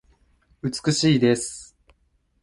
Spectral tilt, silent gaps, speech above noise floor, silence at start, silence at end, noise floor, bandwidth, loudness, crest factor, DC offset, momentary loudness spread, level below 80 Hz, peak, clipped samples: -5 dB/octave; none; 45 dB; 0.65 s; 0.8 s; -66 dBFS; 11.5 kHz; -22 LUFS; 18 dB; under 0.1%; 14 LU; -56 dBFS; -6 dBFS; under 0.1%